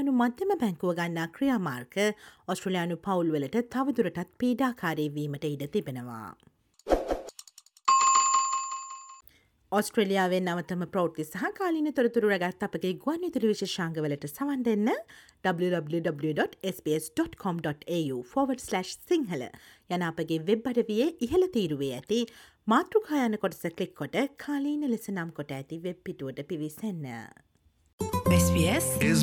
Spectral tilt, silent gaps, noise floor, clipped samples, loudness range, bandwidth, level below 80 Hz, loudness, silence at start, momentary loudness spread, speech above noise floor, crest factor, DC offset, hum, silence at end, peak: -5 dB/octave; 27.93-27.98 s; -61 dBFS; under 0.1%; 5 LU; 18.5 kHz; -54 dBFS; -29 LUFS; 0 s; 12 LU; 32 dB; 20 dB; under 0.1%; none; 0 s; -10 dBFS